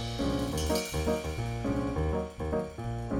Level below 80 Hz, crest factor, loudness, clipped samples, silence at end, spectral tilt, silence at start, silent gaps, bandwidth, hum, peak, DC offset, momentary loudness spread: -40 dBFS; 14 dB; -32 LUFS; under 0.1%; 0 s; -5.5 dB/octave; 0 s; none; 18.5 kHz; none; -16 dBFS; under 0.1%; 4 LU